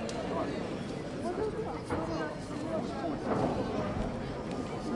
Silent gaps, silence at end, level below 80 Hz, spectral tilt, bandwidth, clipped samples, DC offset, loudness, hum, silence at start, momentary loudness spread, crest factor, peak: none; 0 s; -50 dBFS; -6.5 dB/octave; 11.5 kHz; under 0.1%; under 0.1%; -35 LUFS; none; 0 s; 6 LU; 18 dB; -18 dBFS